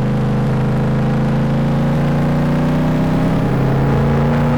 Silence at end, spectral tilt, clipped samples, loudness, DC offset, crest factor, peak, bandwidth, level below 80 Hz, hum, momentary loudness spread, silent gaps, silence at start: 0 s; -8.5 dB/octave; under 0.1%; -16 LUFS; 3%; 6 dB; -8 dBFS; 10 kHz; -30 dBFS; none; 2 LU; none; 0 s